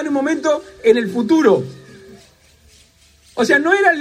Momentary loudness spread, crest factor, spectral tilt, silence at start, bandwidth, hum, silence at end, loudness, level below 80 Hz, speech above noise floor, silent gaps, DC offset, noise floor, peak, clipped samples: 7 LU; 16 dB; -5 dB/octave; 0 s; 14.5 kHz; none; 0 s; -15 LUFS; -58 dBFS; 36 dB; none; under 0.1%; -51 dBFS; -2 dBFS; under 0.1%